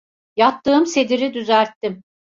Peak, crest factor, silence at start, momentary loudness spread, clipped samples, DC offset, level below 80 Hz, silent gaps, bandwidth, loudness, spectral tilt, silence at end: -2 dBFS; 16 dB; 0.35 s; 12 LU; under 0.1%; under 0.1%; -62 dBFS; 1.76-1.81 s; 7.8 kHz; -18 LUFS; -4 dB/octave; 0.4 s